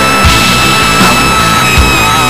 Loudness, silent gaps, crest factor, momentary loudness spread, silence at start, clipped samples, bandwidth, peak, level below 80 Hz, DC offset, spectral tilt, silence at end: -6 LUFS; none; 6 dB; 1 LU; 0 s; 1%; 17 kHz; 0 dBFS; -18 dBFS; under 0.1%; -3 dB/octave; 0 s